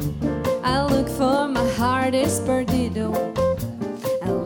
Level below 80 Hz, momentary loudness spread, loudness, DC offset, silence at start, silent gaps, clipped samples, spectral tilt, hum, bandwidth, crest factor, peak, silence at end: -40 dBFS; 5 LU; -22 LUFS; under 0.1%; 0 s; none; under 0.1%; -5.5 dB/octave; none; 19 kHz; 14 dB; -8 dBFS; 0 s